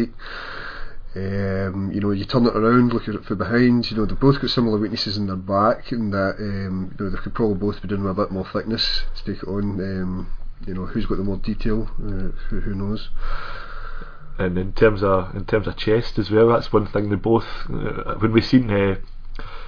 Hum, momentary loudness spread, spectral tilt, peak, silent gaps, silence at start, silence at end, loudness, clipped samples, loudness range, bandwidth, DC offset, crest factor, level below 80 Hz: none; 15 LU; -8 dB/octave; -2 dBFS; none; 0 s; 0 s; -22 LUFS; under 0.1%; 8 LU; 5.4 kHz; under 0.1%; 20 dB; -30 dBFS